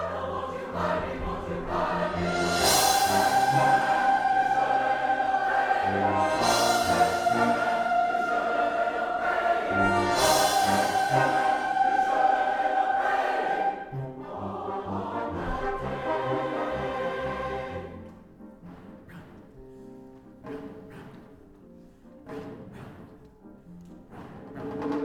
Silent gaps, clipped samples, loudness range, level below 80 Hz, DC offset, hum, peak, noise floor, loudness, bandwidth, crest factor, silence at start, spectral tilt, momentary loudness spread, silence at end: none; under 0.1%; 22 LU; -50 dBFS; under 0.1%; none; -10 dBFS; -51 dBFS; -25 LUFS; 19 kHz; 18 dB; 0 s; -3.5 dB/octave; 20 LU; 0 s